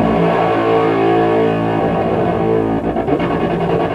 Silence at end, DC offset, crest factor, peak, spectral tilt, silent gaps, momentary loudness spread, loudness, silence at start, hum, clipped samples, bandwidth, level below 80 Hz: 0 s; under 0.1%; 12 dB; -2 dBFS; -8.5 dB/octave; none; 3 LU; -15 LUFS; 0 s; none; under 0.1%; 9.4 kHz; -38 dBFS